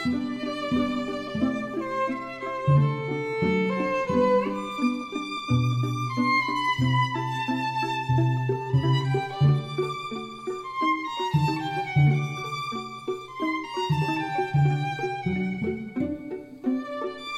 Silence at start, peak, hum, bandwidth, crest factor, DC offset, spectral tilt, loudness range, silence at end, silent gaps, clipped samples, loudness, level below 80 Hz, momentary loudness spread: 0 s; -10 dBFS; none; 10 kHz; 16 dB; under 0.1%; -7 dB/octave; 3 LU; 0 s; none; under 0.1%; -26 LUFS; -54 dBFS; 9 LU